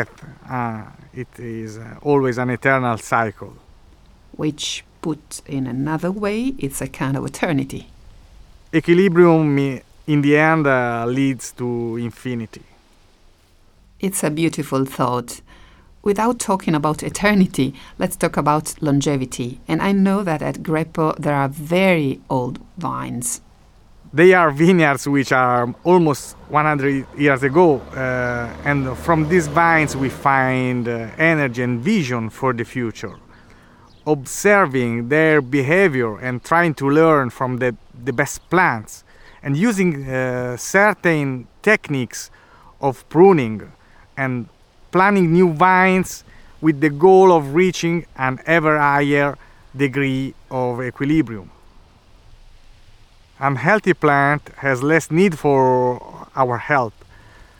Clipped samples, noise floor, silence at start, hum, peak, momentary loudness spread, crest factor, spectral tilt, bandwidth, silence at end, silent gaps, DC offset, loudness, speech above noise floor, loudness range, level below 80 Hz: under 0.1%; -52 dBFS; 0 s; none; -2 dBFS; 14 LU; 18 dB; -6 dB/octave; 18.5 kHz; 0.7 s; none; under 0.1%; -18 LUFS; 34 dB; 8 LU; -46 dBFS